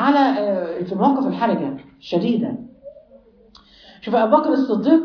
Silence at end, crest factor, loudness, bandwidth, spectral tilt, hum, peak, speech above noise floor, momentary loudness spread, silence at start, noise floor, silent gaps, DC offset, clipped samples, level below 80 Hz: 0 s; 18 dB; -19 LUFS; 5.4 kHz; -8 dB/octave; none; -2 dBFS; 32 dB; 14 LU; 0 s; -50 dBFS; none; under 0.1%; under 0.1%; -62 dBFS